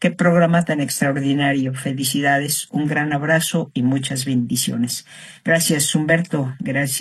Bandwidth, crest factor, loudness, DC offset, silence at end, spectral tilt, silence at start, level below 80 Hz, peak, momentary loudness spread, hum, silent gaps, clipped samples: 13.5 kHz; 16 dB; -19 LUFS; under 0.1%; 0 s; -4.5 dB/octave; 0 s; -60 dBFS; -4 dBFS; 7 LU; none; none; under 0.1%